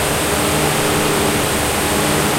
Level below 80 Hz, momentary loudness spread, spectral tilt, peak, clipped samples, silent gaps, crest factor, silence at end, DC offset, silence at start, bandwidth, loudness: -34 dBFS; 1 LU; -3 dB/octave; -2 dBFS; under 0.1%; none; 14 dB; 0 s; under 0.1%; 0 s; 16 kHz; -16 LUFS